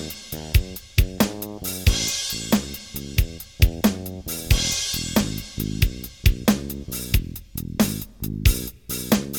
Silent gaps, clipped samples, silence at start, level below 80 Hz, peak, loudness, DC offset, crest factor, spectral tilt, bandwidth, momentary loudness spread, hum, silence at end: none; under 0.1%; 0 s; -28 dBFS; -4 dBFS; -24 LUFS; 0.1%; 20 dB; -4 dB/octave; 19 kHz; 10 LU; none; 0 s